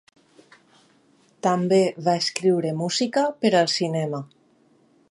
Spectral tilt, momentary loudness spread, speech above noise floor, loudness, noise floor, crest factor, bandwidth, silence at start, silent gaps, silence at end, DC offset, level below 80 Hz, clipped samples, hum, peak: -5 dB/octave; 8 LU; 38 dB; -22 LUFS; -60 dBFS; 20 dB; 11.5 kHz; 1.45 s; none; 0.85 s; under 0.1%; -72 dBFS; under 0.1%; none; -4 dBFS